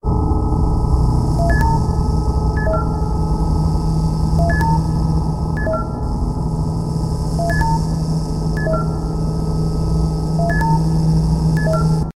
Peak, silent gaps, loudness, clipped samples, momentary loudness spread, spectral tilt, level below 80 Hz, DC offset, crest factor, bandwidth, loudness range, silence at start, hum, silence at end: -2 dBFS; none; -18 LUFS; under 0.1%; 5 LU; -7.5 dB/octave; -20 dBFS; under 0.1%; 14 dB; 12 kHz; 2 LU; 0.05 s; none; 0.05 s